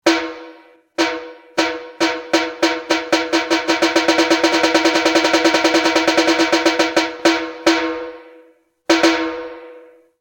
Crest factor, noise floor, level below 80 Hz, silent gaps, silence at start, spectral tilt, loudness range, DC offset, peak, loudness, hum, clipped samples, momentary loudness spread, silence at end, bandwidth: 18 dB; -52 dBFS; -56 dBFS; none; 0.05 s; -2 dB/octave; 5 LU; under 0.1%; 0 dBFS; -16 LUFS; none; under 0.1%; 15 LU; 0.4 s; 17.5 kHz